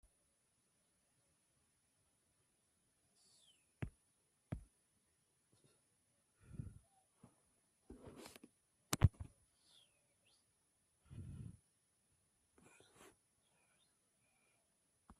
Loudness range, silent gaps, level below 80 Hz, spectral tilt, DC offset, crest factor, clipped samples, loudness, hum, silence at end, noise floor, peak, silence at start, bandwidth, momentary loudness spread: 16 LU; none; -60 dBFS; -5.5 dB/octave; under 0.1%; 36 dB; under 0.1%; -45 LUFS; none; 0.05 s; -81 dBFS; -16 dBFS; 3.8 s; 13 kHz; 29 LU